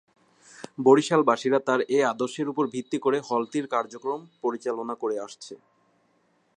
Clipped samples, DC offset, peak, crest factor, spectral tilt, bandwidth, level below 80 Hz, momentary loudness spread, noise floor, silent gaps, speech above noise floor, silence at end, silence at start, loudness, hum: under 0.1%; under 0.1%; -6 dBFS; 20 dB; -5 dB/octave; 10 kHz; -80 dBFS; 14 LU; -67 dBFS; none; 42 dB; 1 s; 0.6 s; -25 LUFS; none